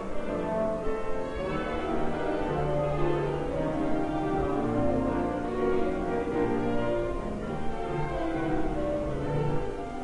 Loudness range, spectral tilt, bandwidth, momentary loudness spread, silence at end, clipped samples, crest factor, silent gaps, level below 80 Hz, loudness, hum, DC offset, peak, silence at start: 2 LU; -8 dB/octave; 11 kHz; 5 LU; 0 s; under 0.1%; 14 dB; none; -40 dBFS; -30 LUFS; none; 0.1%; -14 dBFS; 0 s